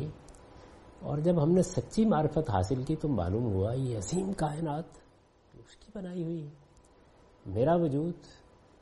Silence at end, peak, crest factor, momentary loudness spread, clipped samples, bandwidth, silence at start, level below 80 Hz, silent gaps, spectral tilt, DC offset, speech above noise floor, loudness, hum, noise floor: 0.5 s; -14 dBFS; 18 dB; 17 LU; under 0.1%; 11.5 kHz; 0 s; -54 dBFS; none; -7.5 dB/octave; under 0.1%; 32 dB; -31 LUFS; none; -62 dBFS